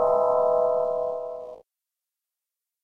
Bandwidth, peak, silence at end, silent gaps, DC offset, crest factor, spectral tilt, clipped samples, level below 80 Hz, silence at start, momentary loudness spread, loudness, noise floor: 4.2 kHz; -10 dBFS; 1.25 s; none; under 0.1%; 16 dB; -7.5 dB/octave; under 0.1%; -66 dBFS; 0 s; 16 LU; -24 LUFS; -88 dBFS